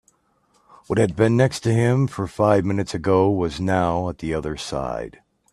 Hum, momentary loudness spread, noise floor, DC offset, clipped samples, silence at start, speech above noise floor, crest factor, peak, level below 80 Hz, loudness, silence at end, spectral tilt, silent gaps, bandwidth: none; 9 LU; -63 dBFS; under 0.1%; under 0.1%; 0.9 s; 43 dB; 20 dB; -2 dBFS; -46 dBFS; -21 LUFS; 0.45 s; -7 dB/octave; none; 12.5 kHz